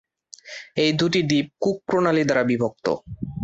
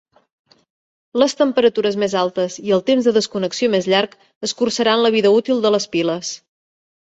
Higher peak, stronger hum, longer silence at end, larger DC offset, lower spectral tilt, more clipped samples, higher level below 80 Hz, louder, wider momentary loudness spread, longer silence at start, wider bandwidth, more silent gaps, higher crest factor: second, -6 dBFS vs -2 dBFS; neither; second, 0 s vs 0.65 s; neither; first, -5.5 dB/octave vs -4 dB/octave; neither; first, -54 dBFS vs -64 dBFS; second, -22 LUFS vs -17 LUFS; about the same, 11 LU vs 10 LU; second, 0.45 s vs 1.15 s; about the same, 8 kHz vs 8.2 kHz; second, none vs 4.35-4.41 s; about the same, 16 dB vs 16 dB